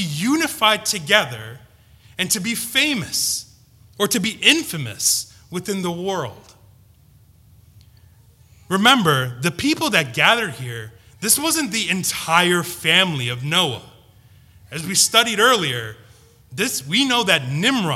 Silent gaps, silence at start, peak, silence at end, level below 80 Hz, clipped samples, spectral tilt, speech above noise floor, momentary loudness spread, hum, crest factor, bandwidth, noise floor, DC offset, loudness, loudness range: none; 0 s; 0 dBFS; 0 s; -56 dBFS; under 0.1%; -2.5 dB/octave; 32 dB; 14 LU; none; 20 dB; 16.5 kHz; -51 dBFS; under 0.1%; -18 LUFS; 5 LU